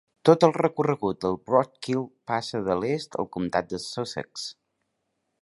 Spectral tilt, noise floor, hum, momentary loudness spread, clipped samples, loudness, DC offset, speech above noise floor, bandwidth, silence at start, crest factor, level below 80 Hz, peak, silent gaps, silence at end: -6 dB/octave; -77 dBFS; none; 13 LU; under 0.1%; -26 LUFS; under 0.1%; 52 dB; 11.5 kHz; 0.25 s; 24 dB; -60 dBFS; -2 dBFS; none; 0.9 s